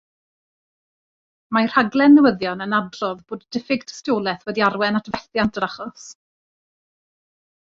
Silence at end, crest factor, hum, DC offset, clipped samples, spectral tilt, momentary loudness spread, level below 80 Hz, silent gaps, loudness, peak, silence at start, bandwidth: 1.55 s; 20 dB; none; under 0.1%; under 0.1%; -5.5 dB/octave; 15 LU; -58 dBFS; none; -20 LUFS; -2 dBFS; 1.5 s; 7.4 kHz